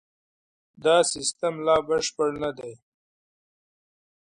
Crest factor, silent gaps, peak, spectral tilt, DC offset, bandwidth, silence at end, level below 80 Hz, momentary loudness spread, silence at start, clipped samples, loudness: 20 dB; none; -6 dBFS; -2.5 dB/octave; under 0.1%; 11 kHz; 1.5 s; -60 dBFS; 11 LU; 0.8 s; under 0.1%; -24 LUFS